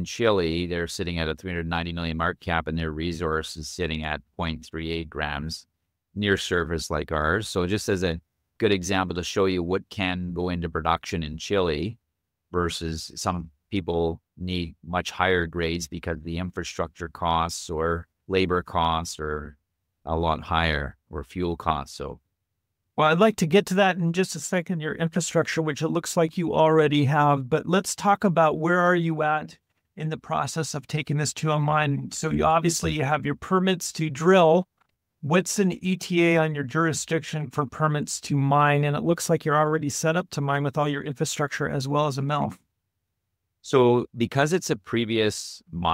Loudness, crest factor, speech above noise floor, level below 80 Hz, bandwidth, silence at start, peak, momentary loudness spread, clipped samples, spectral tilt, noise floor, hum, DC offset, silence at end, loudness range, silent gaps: -25 LUFS; 20 dB; 56 dB; -46 dBFS; 16 kHz; 0 s; -4 dBFS; 11 LU; under 0.1%; -5 dB/octave; -81 dBFS; none; under 0.1%; 0 s; 6 LU; none